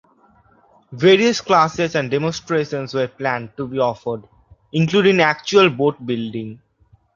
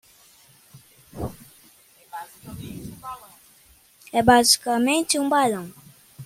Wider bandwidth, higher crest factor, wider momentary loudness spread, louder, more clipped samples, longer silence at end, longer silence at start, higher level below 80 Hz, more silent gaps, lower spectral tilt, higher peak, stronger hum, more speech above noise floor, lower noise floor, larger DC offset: second, 7.4 kHz vs 16.5 kHz; about the same, 18 dB vs 22 dB; second, 13 LU vs 23 LU; about the same, -18 LUFS vs -19 LUFS; neither; first, 0.6 s vs 0 s; first, 0.9 s vs 0.75 s; about the same, -56 dBFS vs -54 dBFS; neither; first, -5.5 dB/octave vs -3 dB/octave; about the same, -2 dBFS vs -2 dBFS; neither; about the same, 38 dB vs 36 dB; about the same, -56 dBFS vs -55 dBFS; neither